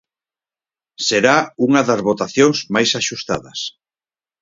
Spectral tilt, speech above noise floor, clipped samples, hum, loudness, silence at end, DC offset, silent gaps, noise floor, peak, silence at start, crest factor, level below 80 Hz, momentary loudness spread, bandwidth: -3.5 dB/octave; over 73 dB; under 0.1%; none; -17 LUFS; 0.75 s; under 0.1%; none; under -90 dBFS; 0 dBFS; 1 s; 18 dB; -58 dBFS; 10 LU; 7.8 kHz